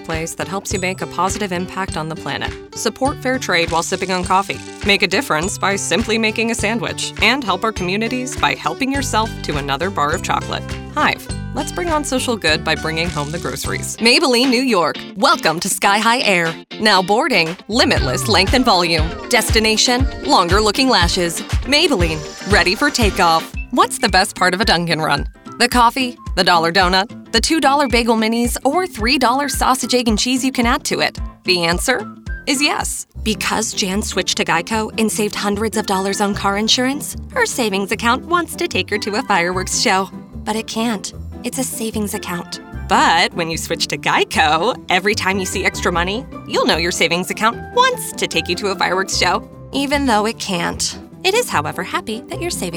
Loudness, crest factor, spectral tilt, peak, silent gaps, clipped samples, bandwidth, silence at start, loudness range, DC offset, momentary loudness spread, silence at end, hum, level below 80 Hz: -17 LUFS; 16 dB; -3 dB/octave; -2 dBFS; none; under 0.1%; over 20 kHz; 0 s; 5 LU; under 0.1%; 9 LU; 0 s; none; -32 dBFS